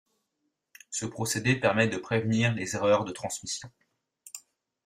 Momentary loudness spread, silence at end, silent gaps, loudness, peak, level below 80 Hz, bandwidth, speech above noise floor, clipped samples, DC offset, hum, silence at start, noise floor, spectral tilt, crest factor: 17 LU; 0.45 s; none; -28 LUFS; -8 dBFS; -64 dBFS; 15.5 kHz; 52 dB; under 0.1%; under 0.1%; none; 0.9 s; -80 dBFS; -4.5 dB/octave; 22 dB